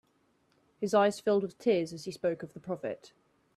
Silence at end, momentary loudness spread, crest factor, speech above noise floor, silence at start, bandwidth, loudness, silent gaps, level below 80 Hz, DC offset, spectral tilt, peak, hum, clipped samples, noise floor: 0.5 s; 13 LU; 20 dB; 40 dB; 0.8 s; 13.5 kHz; -31 LUFS; none; -74 dBFS; under 0.1%; -5.5 dB/octave; -12 dBFS; none; under 0.1%; -71 dBFS